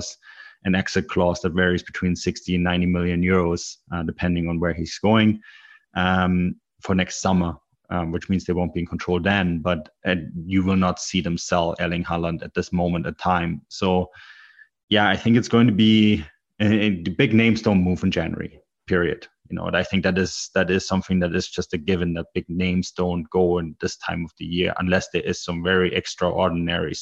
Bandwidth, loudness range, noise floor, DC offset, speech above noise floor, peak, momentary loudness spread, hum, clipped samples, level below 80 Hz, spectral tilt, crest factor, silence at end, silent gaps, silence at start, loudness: 8 kHz; 4 LU; -51 dBFS; under 0.1%; 29 dB; -4 dBFS; 10 LU; none; under 0.1%; -46 dBFS; -5.5 dB/octave; 18 dB; 0 s; 14.83-14.88 s; 0 s; -22 LUFS